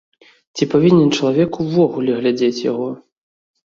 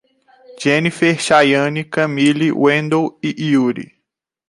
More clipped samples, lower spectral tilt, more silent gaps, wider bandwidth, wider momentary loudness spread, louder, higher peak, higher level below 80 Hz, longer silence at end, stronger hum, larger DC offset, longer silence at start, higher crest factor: neither; about the same, -6.5 dB/octave vs -5.5 dB/octave; neither; second, 7.6 kHz vs 11.5 kHz; first, 13 LU vs 9 LU; about the same, -16 LUFS vs -15 LUFS; about the same, -2 dBFS vs -2 dBFS; about the same, -56 dBFS vs -60 dBFS; first, 0.8 s vs 0.65 s; neither; neither; about the same, 0.55 s vs 0.5 s; about the same, 16 dB vs 16 dB